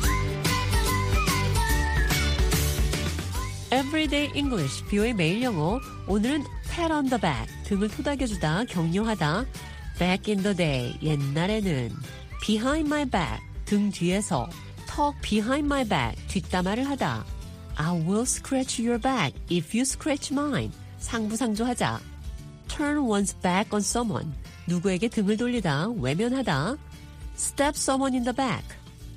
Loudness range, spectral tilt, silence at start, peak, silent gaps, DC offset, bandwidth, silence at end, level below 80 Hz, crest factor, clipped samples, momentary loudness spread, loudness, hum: 2 LU; -5 dB/octave; 0 s; -8 dBFS; none; under 0.1%; 15.5 kHz; 0 s; -36 dBFS; 18 dB; under 0.1%; 10 LU; -26 LUFS; none